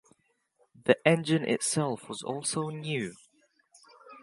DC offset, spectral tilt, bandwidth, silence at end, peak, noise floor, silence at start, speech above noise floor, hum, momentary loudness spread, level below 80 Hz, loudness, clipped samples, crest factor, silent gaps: under 0.1%; -4.5 dB/octave; 11.5 kHz; 0.05 s; -6 dBFS; -71 dBFS; 0.85 s; 43 dB; none; 11 LU; -74 dBFS; -29 LUFS; under 0.1%; 26 dB; none